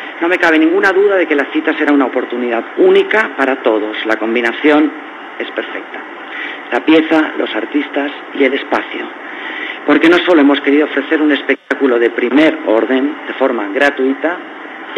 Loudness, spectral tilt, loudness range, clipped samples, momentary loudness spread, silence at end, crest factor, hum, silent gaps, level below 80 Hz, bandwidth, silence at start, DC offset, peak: -13 LUFS; -5 dB/octave; 4 LU; under 0.1%; 13 LU; 0 s; 14 dB; none; none; -64 dBFS; 8.4 kHz; 0 s; under 0.1%; 0 dBFS